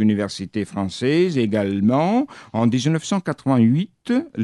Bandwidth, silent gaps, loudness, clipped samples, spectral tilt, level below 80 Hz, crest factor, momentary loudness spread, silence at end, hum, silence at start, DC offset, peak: 11 kHz; none; -20 LUFS; under 0.1%; -6.5 dB/octave; -62 dBFS; 14 dB; 8 LU; 0 s; none; 0 s; under 0.1%; -6 dBFS